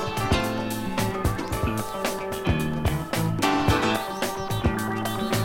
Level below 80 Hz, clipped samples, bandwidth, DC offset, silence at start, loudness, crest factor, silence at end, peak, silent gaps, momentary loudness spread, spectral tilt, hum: -36 dBFS; under 0.1%; 17 kHz; under 0.1%; 0 s; -26 LUFS; 18 dB; 0 s; -8 dBFS; none; 6 LU; -5 dB/octave; none